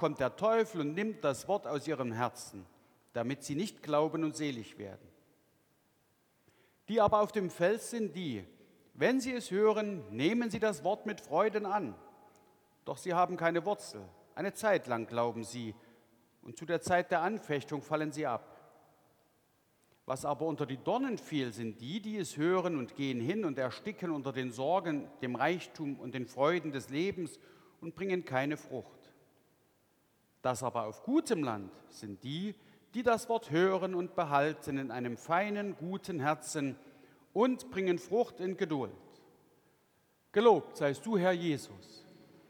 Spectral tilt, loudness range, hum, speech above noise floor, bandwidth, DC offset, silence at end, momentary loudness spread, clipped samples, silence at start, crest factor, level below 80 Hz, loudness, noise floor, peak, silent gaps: -5.5 dB/octave; 5 LU; none; 39 dB; 19.5 kHz; under 0.1%; 0.5 s; 13 LU; under 0.1%; 0 s; 22 dB; -74 dBFS; -34 LUFS; -72 dBFS; -12 dBFS; none